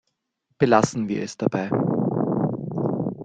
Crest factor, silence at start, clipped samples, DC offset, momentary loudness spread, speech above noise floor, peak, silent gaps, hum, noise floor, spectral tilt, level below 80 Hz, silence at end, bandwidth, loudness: 20 dB; 0.6 s; under 0.1%; under 0.1%; 8 LU; 53 dB; -2 dBFS; none; none; -74 dBFS; -7 dB/octave; -60 dBFS; 0 s; 9.4 kHz; -23 LUFS